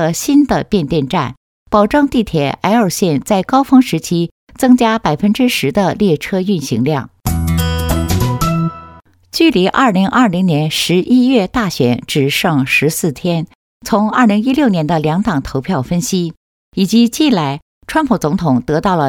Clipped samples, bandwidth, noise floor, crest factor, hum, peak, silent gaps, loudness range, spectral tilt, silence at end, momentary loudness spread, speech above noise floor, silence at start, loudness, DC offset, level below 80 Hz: under 0.1%; 18 kHz; -40 dBFS; 14 dB; none; 0 dBFS; 1.37-1.66 s, 4.31-4.47 s, 13.55-13.81 s, 16.37-16.72 s, 17.62-17.81 s; 3 LU; -5.5 dB/octave; 0 s; 7 LU; 27 dB; 0 s; -14 LUFS; under 0.1%; -34 dBFS